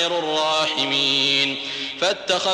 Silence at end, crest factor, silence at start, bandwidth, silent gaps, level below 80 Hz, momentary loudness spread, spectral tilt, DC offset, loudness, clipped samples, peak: 0 s; 14 dB; 0 s; 14 kHz; none; -66 dBFS; 6 LU; -2 dB/octave; under 0.1%; -19 LUFS; under 0.1%; -8 dBFS